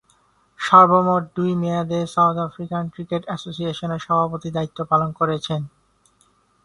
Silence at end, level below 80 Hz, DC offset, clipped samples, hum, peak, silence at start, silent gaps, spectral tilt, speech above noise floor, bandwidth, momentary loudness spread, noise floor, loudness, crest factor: 0.95 s; -58 dBFS; under 0.1%; under 0.1%; none; 0 dBFS; 0.6 s; none; -7 dB/octave; 41 dB; 11 kHz; 14 LU; -61 dBFS; -20 LUFS; 20 dB